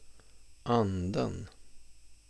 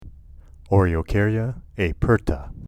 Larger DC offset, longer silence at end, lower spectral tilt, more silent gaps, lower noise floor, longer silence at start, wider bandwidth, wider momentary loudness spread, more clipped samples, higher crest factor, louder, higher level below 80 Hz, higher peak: neither; first, 0.15 s vs 0 s; second, -7 dB/octave vs -8.5 dB/octave; neither; first, -52 dBFS vs -44 dBFS; about the same, 0 s vs 0 s; about the same, 11 kHz vs 10.5 kHz; first, 15 LU vs 7 LU; neither; about the same, 20 dB vs 18 dB; second, -32 LUFS vs -22 LUFS; second, -56 dBFS vs -32 dBFS; second, -14 dBFS vs -4 dBFS